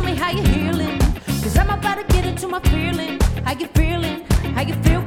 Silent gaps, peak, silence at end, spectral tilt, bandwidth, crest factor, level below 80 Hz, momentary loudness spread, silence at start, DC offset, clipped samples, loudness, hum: none; -2 dBFS; 0 s; -5.5 dB/octave; 17 kHz; 16 dB; -22 dBFS; 4 LU; 0 s; under 0.1%; under 0.1%; -20 LUFS; none